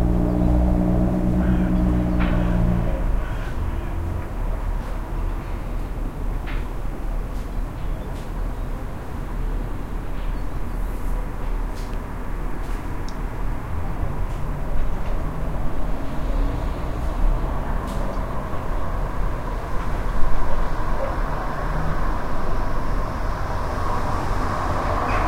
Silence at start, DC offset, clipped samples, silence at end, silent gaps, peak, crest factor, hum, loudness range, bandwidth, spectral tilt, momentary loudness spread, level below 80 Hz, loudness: 0 s; under 0.1%; under 0.1%; 0 s; none; -4 dBFS; 18 dB; none; 8 LU; 12 kHz; -7.5 dB/octave; 10 LU; -24 dBFS; -27 LUFS